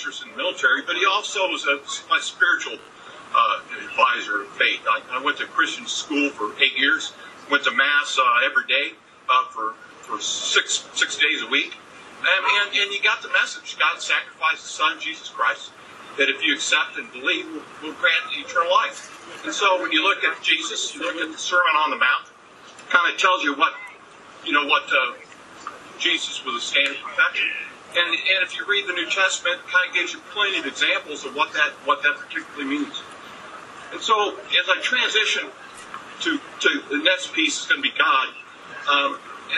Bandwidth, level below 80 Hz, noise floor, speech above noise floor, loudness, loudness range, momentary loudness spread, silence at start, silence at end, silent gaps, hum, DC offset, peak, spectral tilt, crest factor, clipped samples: 12 kHz; -74 dBFS; -45 dBFS; 23 dB; -21 LUFS; 3 LU; 15 LU; 0 s; 0 s; none; none; under 0.1%; -2 dBFS; 0 dB/octave; 22 dB; under 0.1%